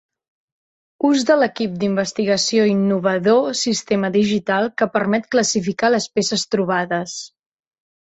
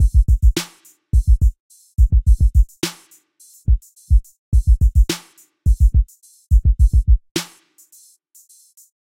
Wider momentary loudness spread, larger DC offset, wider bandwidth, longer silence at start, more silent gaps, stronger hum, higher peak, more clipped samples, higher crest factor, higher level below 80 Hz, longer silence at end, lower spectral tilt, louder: second, 5 LU vs 11 LU; neither; second, 8.2 kHz vs 14.5 kHz; first, 1 s vs 0 s; second, none vs 1.60-1.70 s, 4.39-4.52 s, 7.31-7.35 s; neither; about the same, -4 dBFS vs -4 dBFS; neither; about the same, 16 dB vs 12 dB; second, -62 dBFS vs -16 dBFS; second, 0.75 s vs 1.6 s; second, -4 dB/octave vs -5.5 dB/octave; about the same, -18 LUFS vs -19 LUFS